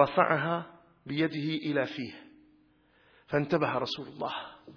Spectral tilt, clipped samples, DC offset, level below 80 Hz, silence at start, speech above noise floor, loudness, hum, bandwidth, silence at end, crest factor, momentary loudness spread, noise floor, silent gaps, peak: -7 dB/octave; under 0.1%; under 0.1%; -68 dBFS; 0 s; 35 dB; -31 LUFS; none; 5.4 kHz; 0 s; 24 dB; 15 LU; -65 dBFS; none; -8 dBFS